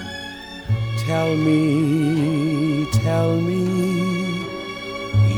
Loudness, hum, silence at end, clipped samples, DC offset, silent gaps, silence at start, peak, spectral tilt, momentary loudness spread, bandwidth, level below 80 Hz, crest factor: -21 LUFS; none; 0 s; under 0.1%; under 0.1%; none; 0 s; -6 dBFS; -7 dB/octave; 11 LU; 17.5 kHz; -44 dBFS; 12 dB